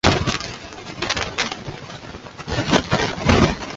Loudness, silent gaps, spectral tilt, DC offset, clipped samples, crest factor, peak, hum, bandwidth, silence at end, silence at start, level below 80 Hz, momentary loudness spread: -21 LUFS; none; -4.5 dB/octave; under 0.1%; under 0.1%; 20 dB; 0 dBFS; none; 8 kHz; 0 s; 0.05 s; -34 dBFS; 17 LU